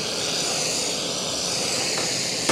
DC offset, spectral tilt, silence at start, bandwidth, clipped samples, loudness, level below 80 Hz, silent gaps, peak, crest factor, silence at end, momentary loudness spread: under 0.1%; -1 dB/octave; 0 s; 16 kHz; under 0.1%; -23 LUFS; -56 dBFS; none; -4 dBFS; 22 dB; 0 s; 2 LU